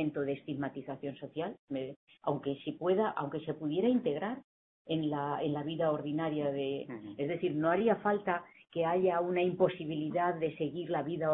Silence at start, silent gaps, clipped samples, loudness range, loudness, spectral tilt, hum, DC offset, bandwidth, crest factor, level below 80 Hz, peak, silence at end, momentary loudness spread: 0 s; 1.59-1.67 s, 1.96-2.07 s, 4.44-4.85 s; under 0.1%; 4 LU; -34 LUFS; -10.5 dB/octave; none; under 0.1%; 4 kHz; 18 dB; -74 dBFS; -16 dBFS; 0 s; 10 LU